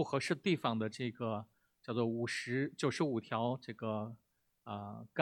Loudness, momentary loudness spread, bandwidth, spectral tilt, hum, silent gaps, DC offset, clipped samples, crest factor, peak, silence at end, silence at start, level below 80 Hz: -38 LUFS; 11 LU; 13 kHz; -5.5 dB/octave; none; none; under 0.1%; under 0.1%; 22 dB; -16 dBFS; 0 s; 0 s; -80 dBFS